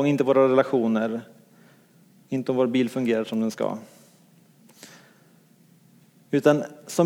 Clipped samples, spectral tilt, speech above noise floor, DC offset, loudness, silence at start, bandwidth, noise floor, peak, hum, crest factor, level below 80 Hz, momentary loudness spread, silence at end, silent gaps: under 0.1%; -6.5 dB/octave; 34 dB; under 0.1%; -23 LUFS; 0 s; 17.5 kHz; -57 dBFS; -4 dBFS; none; 20 dB; -80 dBFS; 11 LU; 0 s; none